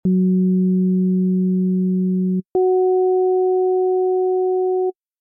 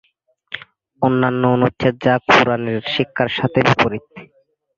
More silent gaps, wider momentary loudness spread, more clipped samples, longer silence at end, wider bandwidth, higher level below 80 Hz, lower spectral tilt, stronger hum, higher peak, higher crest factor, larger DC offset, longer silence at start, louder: neither; second, 3 LU vs 18 LU; neither; second, 0.3 s vs 0.55 s; second, 0.9 kHz vs 7.4 kHz; second, -62 dBFS vs -50 dBFS; first, -15.5 dB/octave vs -6.5 dB/octave; neither; second, -12 dBFS vs 0 dBFS; second, 6 dB vs 18 dB; neither; second, 0.05 s vs 0.5 s; about the same, -18 LUFS vs -16 LUFS